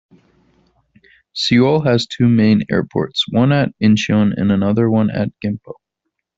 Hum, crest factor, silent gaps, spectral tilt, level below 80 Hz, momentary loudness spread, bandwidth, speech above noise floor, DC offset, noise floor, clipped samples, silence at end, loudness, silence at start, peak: none; 16 dB; none; -6.5 dB/octave; -52 dBFS; 8 LU; 7.8 kHz; 61 dB; under 0.1%; -76 dBFS; under 0.1%; 0.65 s; -15 LUFS; 1.35 s; -2 dBFS